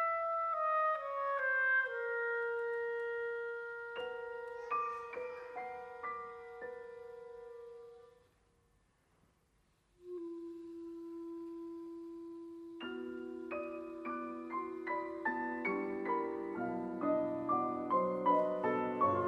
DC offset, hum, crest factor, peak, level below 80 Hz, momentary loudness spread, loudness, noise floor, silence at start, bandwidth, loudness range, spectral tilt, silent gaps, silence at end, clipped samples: under 0.1%; none; 18 dB; -20 dBFS; -76 dBFS; 16 LU; -38 LUFS; -74 dBFS; 0 s; 10.5 kHz; 17 LU; -7 dB/octave; none; 0 s; under 0.1%